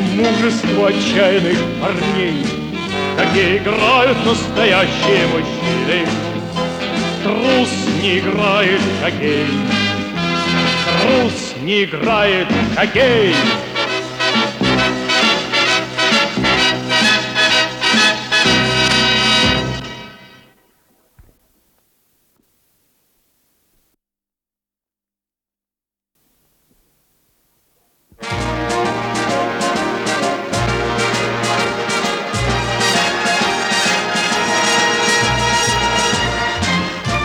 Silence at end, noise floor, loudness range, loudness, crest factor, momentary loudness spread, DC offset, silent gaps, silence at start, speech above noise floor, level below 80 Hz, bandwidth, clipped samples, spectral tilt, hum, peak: 0 s; -89 dBFS; 7 LU; -15 LUFS; 14 dB; 7 LU; under 0.1%; none; 0 s; 74 dB; -40 dBFS; 19.5 kHz; under 0.1%; -3.5 dB/octave; none; -2 dBFS